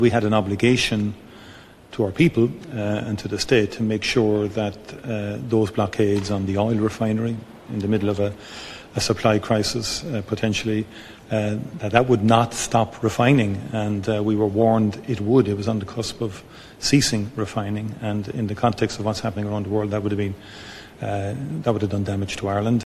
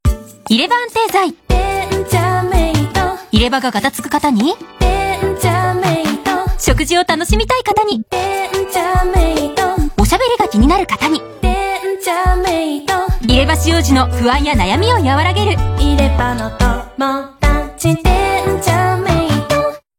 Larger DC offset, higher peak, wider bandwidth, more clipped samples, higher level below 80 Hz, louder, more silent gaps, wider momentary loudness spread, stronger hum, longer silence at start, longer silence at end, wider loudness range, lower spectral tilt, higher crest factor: neither; about the same, 0 dBFS vs 0 dBFS; second, 14 kHz vs 17 kHz; neither; second, -50 dBFS vs -20 dBFS; second, -22 LUFS vs -14 LUFS; neither; first, 11 LU vs 5 LU; neither; about the same, 0 s vs 0.05 s; second, 0.05 s vs 0.2 s; first, 5 LU vs 2 LU; about the same, -5.5 dB/octave vs -5 dB/octave; first, 22 dB vs 14 dB